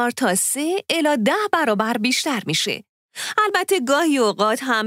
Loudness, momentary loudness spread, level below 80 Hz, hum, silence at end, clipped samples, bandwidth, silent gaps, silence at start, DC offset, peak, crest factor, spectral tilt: -19 LUFS; 5 LU; -72 dBFS; none; 0 s; under 0.1%; 16 kHz; 2.89-3.09 s; 0 s; under 0.1%; -4 dBFS; 18 dB; -3 dB/octave